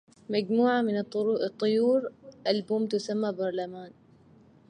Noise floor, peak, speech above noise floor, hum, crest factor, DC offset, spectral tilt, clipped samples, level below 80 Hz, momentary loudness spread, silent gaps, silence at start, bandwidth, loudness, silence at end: -57 dBFS; -12 dBFS; 30 dB; none; 16 dB; under 0.1%; -6 dB/octave; under 0.1%; -76 dBFS; 10 LU; none; 0.3 s; 10 kHz; -28 LUFS; 0.8 s